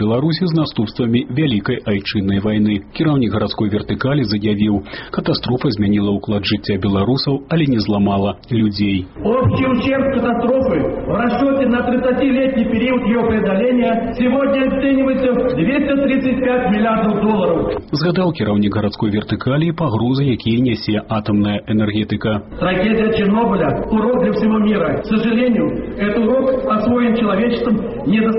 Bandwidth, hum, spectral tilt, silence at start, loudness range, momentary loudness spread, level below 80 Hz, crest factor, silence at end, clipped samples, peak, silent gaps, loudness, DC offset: 5.8 kHz; none; -6 dB/octave; 0 s; 2 LU; 4 LU; -38 dBFS; 12 dB; 0 s; under 0.1%; -4 dBFS; none; -16 LUFS; under 0.1%